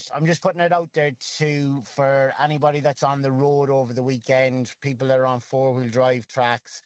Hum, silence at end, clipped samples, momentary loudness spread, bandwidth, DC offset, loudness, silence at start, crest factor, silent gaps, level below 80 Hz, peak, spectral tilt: none; 0.05 s; under 0.1%; 5 LU; 8.2 kHz; under 0.1%; -15 LUFS; 0 s; 16 dB; none; -64 dBFS; 0 dBFS; -6 dB/octave